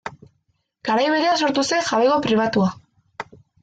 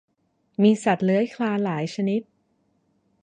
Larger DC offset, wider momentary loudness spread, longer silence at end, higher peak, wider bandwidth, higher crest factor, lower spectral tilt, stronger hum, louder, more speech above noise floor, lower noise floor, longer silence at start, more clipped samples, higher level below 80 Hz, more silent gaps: neither; first, 19 LU vs 7 LU; second, 0.4 s vs 1 s; about the same, -8 dBFS vs -8 dBFS; about the same, 9.2 kHz vs 9.6 kHz; about the same, 14 dB vs 18 dB; second, -4.5 dB/octave vs -7 dB/octave; neither; first, -19 LUFS vs -23 LUFS; about the same, 50 dB vs 48 dB; about the same, -69 dBFS vs -70 dBFS; second, 0.05 s vs 0.6 s; neither; first, -60 dBFS vs -72 dBFS; neither